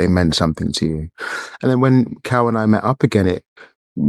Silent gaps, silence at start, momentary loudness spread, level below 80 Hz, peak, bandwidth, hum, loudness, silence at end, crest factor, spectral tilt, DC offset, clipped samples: 3.48-3.56 s, 3.75-3.96 s; 0 s; 11 LU; -40 dBFS; -2 dBFS; 12.5 kHz; none; -18 LUFS; 0 s; 16 dB; -6.5 dB/octave; under 0.1%; under 0.1%